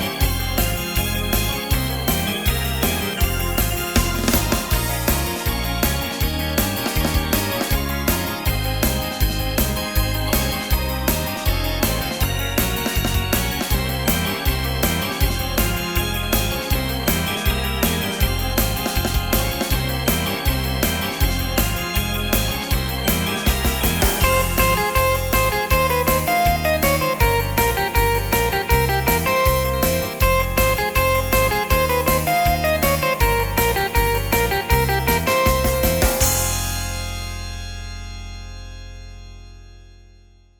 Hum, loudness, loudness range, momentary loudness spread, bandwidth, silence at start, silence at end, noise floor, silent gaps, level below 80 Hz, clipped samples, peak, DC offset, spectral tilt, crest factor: none; -20 LUFS; 3 LU; 4 LU; over 20 kHz; 0 s; 0.65 s; -49 dBFS; none; -26 dBFS; under 0.1%; -2 dBFS; under 0.1%; -4 dB/octave; 18 dB